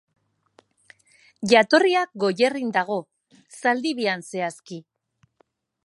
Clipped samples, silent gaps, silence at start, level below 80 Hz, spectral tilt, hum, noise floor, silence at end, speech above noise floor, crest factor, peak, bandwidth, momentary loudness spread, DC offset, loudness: under 0.1%; none; 1.4 s; -74 dBFS; -4 dB/octave; none; -66 dBFS; 1.05 s; 44 dB; 22 dB; -2 dBFS; 11.5 kHz; 15 LU; under 0.1%; -22 LUFS